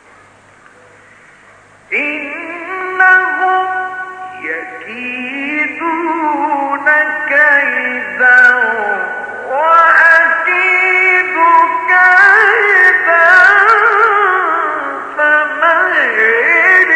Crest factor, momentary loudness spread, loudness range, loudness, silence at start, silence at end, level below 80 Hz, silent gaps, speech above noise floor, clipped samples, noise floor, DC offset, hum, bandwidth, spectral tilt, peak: 12 dB; 15 LU; 8 LU; -9 LUFS; 1.9 s; 0 s; -62 dBFS; none; 26 dB; under 0.1%; -43 dBFS; under 0.1%; none; 10 kHz; -3 dB/octave; 0 dBFS